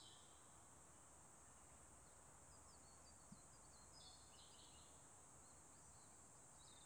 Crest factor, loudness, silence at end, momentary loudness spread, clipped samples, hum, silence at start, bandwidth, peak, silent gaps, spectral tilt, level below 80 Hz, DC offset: 18 dB; -64 LUFS; 0 s; 2 LU; under 0.1%; none; 0 s; over 20 kHz; -48 dBFS; none; -2 dB/octave; -78 dBFS; under 0.1%